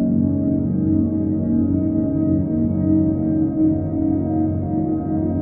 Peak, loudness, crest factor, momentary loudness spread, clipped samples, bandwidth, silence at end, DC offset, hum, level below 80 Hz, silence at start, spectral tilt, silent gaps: -6 dBFS; -20 LUFS; 12 dB; 3 LU; under 0.1%; 2.3 kHz; 0 s; under 0.1%; none; -40 dBFS; 0 s; -15.5 dB/octave; none